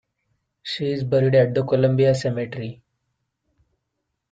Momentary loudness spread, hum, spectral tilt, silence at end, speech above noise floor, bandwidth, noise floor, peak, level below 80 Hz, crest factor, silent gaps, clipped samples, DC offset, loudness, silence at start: 15 LU; none; -7 dB/octave; 1.6 s; 58 dB; 7.8 kHz; -78 dBFS; -6 dBFS; -58 dBFS; 18 dB; none; under 0.1%; under 0.1%; -21 LUFS; 0.65 s